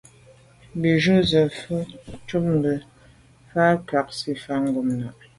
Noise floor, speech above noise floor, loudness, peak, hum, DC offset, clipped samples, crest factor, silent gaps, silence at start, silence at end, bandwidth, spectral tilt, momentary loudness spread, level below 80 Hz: -52 dBFS; 30 dB; -23 LUFS; -6 dBFS; none; under 0.1%; under 0.1%; 16 dB; none; 0.75 s; 0.25 s; 11.5 kHz; -6.5 dB/octave; 12 LU; -52 dBFS